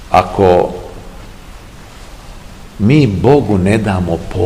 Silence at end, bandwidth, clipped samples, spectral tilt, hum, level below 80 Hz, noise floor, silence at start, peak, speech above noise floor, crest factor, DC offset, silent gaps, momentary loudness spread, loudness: 0 s; 15.5 kHz; 0.6%; -7.5 dB/octave; none; -32 dBFS; -33 dBFS; 0 s; 0 dBFS; 23 dB; 14 dB; 0.5%; none; 22 LU; -12 LUFS